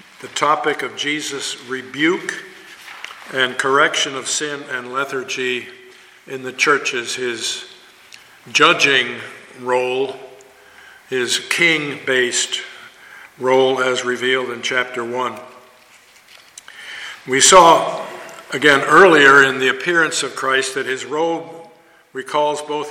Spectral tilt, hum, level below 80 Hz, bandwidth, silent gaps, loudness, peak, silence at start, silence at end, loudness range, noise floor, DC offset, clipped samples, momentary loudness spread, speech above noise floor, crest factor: -2 dB/octave; none; -58 dBFS; 16.5 kHz; none; -16 LUFS; 0 dBFS; 0.2 s; 0 s; 9 LU; -48 dBFS; under 0.1%; under 0.1%; 21 LU; 31 dB; 18 dB